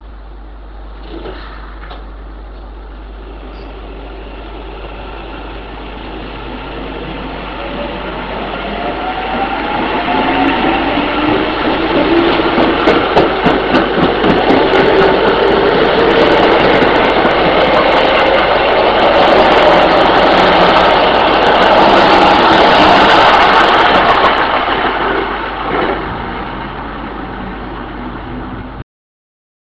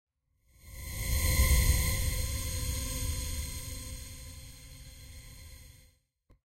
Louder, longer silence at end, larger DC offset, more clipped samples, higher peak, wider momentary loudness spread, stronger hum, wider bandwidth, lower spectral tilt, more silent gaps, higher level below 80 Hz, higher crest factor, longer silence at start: first, -10 LUFS vs -32 LUFS; about the same, 0.95 s vs 0.9 s; neither; first, 0.4% vs under 0.1%; first, 0 dBFS vs -14 dBFS; about the same, 22 LU vs 23 LU; neither; second, 8 kHz vs 16 kHz; first, -6 dB/octave vs -3 dB/octave; neither; first, -30 dBFS vs -36 dBFS; second, 12 dB vs 20 dB; second, 0 s vs 0.65 s